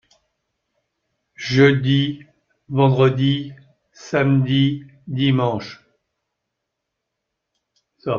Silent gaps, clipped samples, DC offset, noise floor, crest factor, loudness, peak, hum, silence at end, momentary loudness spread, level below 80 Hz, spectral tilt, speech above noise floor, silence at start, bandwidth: none; under 0.1%; under 0.1%; -79 dBFS; 20 dB; -18 LUFS; -2 dBFS; none; 0 s; 17 LU; -58 dBFS; -7.5 dB/octave; 62 dB; 1.4 s; 7 kHz